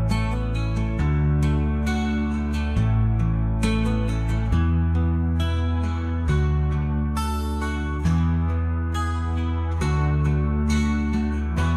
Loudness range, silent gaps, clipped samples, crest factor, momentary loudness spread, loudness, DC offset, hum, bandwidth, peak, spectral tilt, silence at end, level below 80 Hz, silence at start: 1 LU; none; under 0.1%; 12 dB; 4 LU; -23 LUFS; under 0.1%; none; 11.5 kHz; -8 dBFS; -7.5 dB/octave; 0 s; -28 dBFS; 0 s